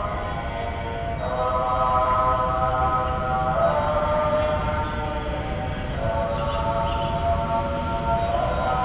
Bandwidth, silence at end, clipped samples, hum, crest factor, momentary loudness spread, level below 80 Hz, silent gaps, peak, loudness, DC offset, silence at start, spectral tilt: 4 kHz; 0 s; under 0.1%; none; 14 dB; 7 LU; -32 dBFS; none; -10 dBFS; -24 LUFS; under 0.1%; 0 s; -10.5 dB/octave